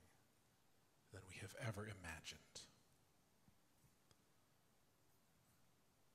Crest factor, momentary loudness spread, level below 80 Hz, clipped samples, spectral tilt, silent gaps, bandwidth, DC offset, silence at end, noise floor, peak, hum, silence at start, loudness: 26 dB; 13 LU; -80 dBFS; under 0.1%; -4 dB/octave; none; 15.5 kHz; under 0.1%; 0.2 s; -79 dBFS; -34 dBFS; none; 0 s; -54 LUFS